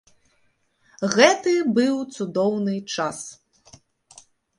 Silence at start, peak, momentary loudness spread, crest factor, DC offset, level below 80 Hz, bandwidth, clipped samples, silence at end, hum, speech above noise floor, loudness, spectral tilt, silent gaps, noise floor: 1 s; -2 dBFS; 13 LU; 22 dB; under 0.1%; -68 dBFS; 11.5 kHz; under 0.1%; 1.25 s; none; 45 dB; -21 LUFS; -4 dB/octave; none; -66 dBFS